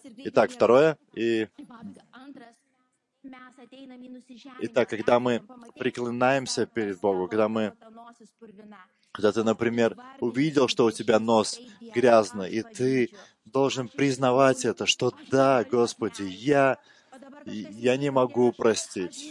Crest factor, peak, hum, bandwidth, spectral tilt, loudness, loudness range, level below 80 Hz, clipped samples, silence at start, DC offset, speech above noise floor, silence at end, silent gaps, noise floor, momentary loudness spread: 18 dB; -6 dBFS; none; 11.5 kHz; -5 dB/octave; -25 LUFS; 6 LU; -72 dBFS; under 0.1%; 0.05 s; under 0.1%; 48 dB; 0 s; none; -73 dBFS; 15 LU